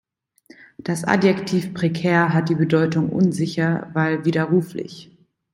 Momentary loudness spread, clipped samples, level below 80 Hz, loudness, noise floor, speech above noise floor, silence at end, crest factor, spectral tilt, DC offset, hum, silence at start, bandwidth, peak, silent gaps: 9 LU; under 0.1%; -60 dBFS; -20 LUFS; -52 dBFS; 33 dB; 0.5 s; 18 dB; -7 dB/octave; under 0.1%; none; 0.85 s; 12 kHz; -2 dBFS; none